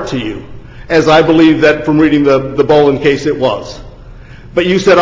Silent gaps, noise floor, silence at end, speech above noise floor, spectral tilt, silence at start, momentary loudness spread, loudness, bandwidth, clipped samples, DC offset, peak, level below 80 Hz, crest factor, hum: none; -32 dBFS; 0 s; 23 dB; -6 dB/octave; 0 s; 14 LU; -10 LUFS; 7.6 kHz; under 0.1%; under 0.1%; 0 dBFS; -36 dBFS; 10 dB; none